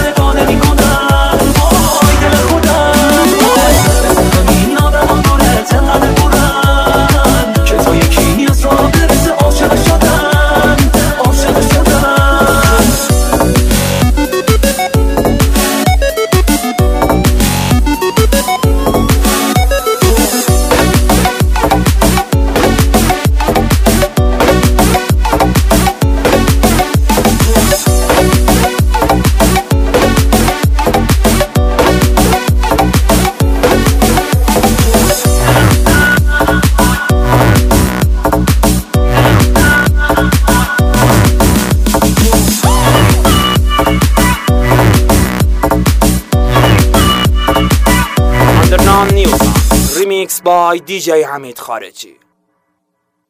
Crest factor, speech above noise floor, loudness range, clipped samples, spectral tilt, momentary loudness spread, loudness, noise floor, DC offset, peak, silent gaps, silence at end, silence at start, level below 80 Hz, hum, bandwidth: 8 dB; 50 dB; 2 LU; under 0.1%; -5 dB/octave; 4 LU; -9 LUFS; -66 dBFS; under 0.1%; 0 dBFS; none; 1.25 s; 0 s; -14 dBFS; none; 16.5 kHz